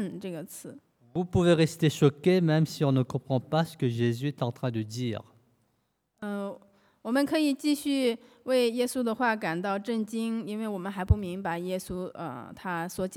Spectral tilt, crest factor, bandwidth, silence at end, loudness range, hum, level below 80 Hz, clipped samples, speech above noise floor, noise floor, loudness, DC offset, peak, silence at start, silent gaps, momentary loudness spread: -6.5 dB/octave; 20 dB; 18 kHz; 0 s; 6 LU; none; -50 dBFS; under 0.1%; 47 dB; -75 dBFS; -29 LUFS; under 0.1%; -8 dBFS; 0 s; none; 14 LU